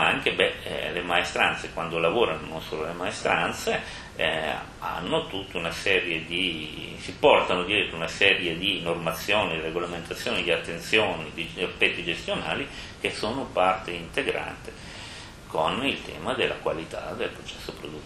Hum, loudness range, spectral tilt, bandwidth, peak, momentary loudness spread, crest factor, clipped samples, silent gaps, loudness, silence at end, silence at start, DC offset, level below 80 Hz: none; 6 LU; -3.5 dB/octave; 14 kHz; -2 dBFS; 12 LU; 24 dB; under 0.1%; none; -26 LUFS; 0 s; 0 s; under 0.1%; -50 dBFS